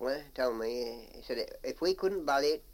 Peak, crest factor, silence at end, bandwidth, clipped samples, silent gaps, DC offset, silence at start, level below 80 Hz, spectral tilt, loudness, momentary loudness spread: -18 dBFS; 16 dB; 0 s; 17 kHz; under 0.1%; none; under 0.1%; 0 s; -56 dBFS; -3.5 dB/octave; -33 LUFS; 10 LU